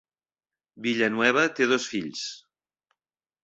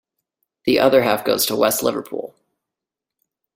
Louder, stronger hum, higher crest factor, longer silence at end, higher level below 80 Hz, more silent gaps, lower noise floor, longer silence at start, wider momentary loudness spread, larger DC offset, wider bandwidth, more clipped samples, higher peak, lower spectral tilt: second, -25 LUFS vs -18 LUFS; neither; first, 24 dB vs 18 dB; second, 1.05 s vs 1.25 s; second, -72 dBFS vs -58 dBFS; neither; first, under -90 dBFS vs -86 dBFS; about the same, 0.75 s vs 0.65 s; second, 12 LU vs 16 LU; neither; second, 8.2 kHz vs 16.5 kHz; neither; about the same, -4 dBFS vs -2 dBFS; about the same, -3.5 dB/octave vs -3.5 dB/octave